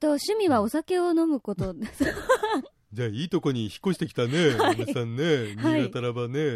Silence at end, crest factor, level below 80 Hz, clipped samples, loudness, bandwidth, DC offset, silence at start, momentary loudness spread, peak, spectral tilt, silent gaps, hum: 0 s; 16 dB; -54 dBFS; under 0.1%; -26 LUFS; 15 kHz; under 0.1%; 0 s; 8 LU; -8 dBFS; -6 dB/octave; none; none